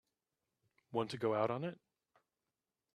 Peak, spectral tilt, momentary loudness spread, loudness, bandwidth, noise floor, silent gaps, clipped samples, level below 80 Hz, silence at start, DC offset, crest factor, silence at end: -20 dBFS; -6.5 dB/octave; 7 LU; -39 LUFS; 12 kHz; under -90 dBFS; none; under 0.1%; -82 dBFS; 0.9 s; under 0.1%; 22 dB; 1.2 s